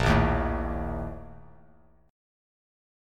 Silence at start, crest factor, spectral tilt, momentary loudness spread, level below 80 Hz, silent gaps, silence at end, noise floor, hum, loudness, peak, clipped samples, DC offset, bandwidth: 0 s; 20 dB; -7 dB/octave; 21 LU; -36 dBFS; none; 1 s; -59 dBFS; none; -28 LUFS; -10 dBFS; under 0.1%; under 0.1%; 12 kHz